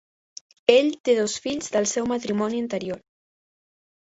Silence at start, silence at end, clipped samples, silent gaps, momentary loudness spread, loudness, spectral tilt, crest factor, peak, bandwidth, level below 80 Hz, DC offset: 0.7 s; 1.05 s; under 0.1%; 1.00-1.04 s; 11 LU; -23 LUFS; -3.5 dB/octave; 22 dB; -2 dBFS; 8.2 kHz; -64 dBFS; under 0.1%